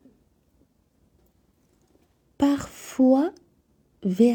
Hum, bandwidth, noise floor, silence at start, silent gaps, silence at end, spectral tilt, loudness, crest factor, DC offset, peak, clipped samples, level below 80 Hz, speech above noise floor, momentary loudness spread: none; 19.5 kHz; -65 dBFS; 2.4 s; none; 0 s; -6.5 dB/octave; -24 LUFS; 20 dB; under 0.1%; -6 dBFS; under 0.1%; -60 dBFS; 44 dB; 11 LU